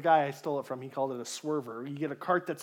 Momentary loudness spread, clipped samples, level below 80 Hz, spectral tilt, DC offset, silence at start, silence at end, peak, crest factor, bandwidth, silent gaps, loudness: 10 LU; under 0.1%; -90 dBFS; -5 dB/octave; under 0.1%; 0 s; 0 s; -12 dBFS; 20 dB; 17 kHz; none; -33 LUFS